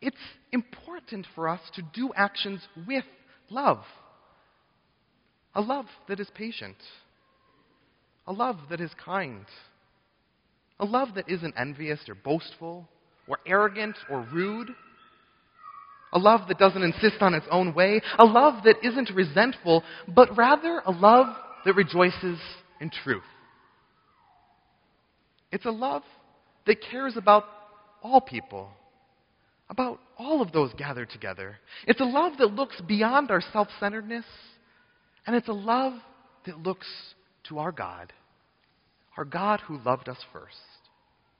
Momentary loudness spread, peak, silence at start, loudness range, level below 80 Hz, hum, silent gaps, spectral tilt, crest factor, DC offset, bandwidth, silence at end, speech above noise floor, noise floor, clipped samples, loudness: 20 LU; 0 dBFS; 0 s; 15 LU; -66 dBFS; none; none; -3.5 dB/octave; 26 dB; under 0.1%; 5.4 kHz; 1 s; 45 dB; -70 dBFS; under 0.1%; -25 LUFS